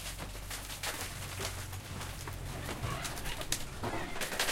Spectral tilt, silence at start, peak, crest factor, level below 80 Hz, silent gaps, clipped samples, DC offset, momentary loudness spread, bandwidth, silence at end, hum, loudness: -3 dB/octave; 0 s; -12 dBFS; 26 dB; -48 dBFS; none; under 0.1%; under 0.1%; 6 LU; 17 kHz; 0 s; none; -39 LUFS